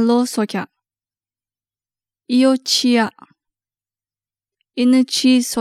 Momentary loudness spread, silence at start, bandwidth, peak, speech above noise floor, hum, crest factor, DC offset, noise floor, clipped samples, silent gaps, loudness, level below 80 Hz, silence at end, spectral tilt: 11 LU; 0 s; 14.5 kHz; -2 dBFS; over 75 dB; none; 16 dB; under 0.1%; under -90 dBFS; under 0.1%; none; -16 LUFS; -68 dBFS; 0 s; -3.5 dB/octave